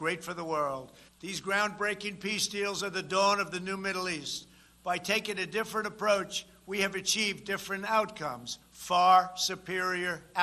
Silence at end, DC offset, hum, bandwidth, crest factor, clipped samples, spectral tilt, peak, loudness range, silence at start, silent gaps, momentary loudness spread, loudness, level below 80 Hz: 0 s; under 0.1%; none; 13 kHz; 20 dB; under 0.1%; -2.5 dB/octave; -10 dBFS; 3 LU; 0 s; none; 11 LU; -30 LUFS; -66 dBFS